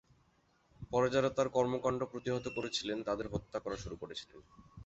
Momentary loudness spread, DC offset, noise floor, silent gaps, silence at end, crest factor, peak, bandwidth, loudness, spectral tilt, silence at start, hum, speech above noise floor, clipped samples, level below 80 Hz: 13 LU; under 0.1%; -72 dBFS; none; 0 s; 20 dB; -18 dBFS; 8 kHz; -36 LUFS; -4.5 dB/octave; 0.8 s; none; 36 dB; under 0.1%; -60 dBFS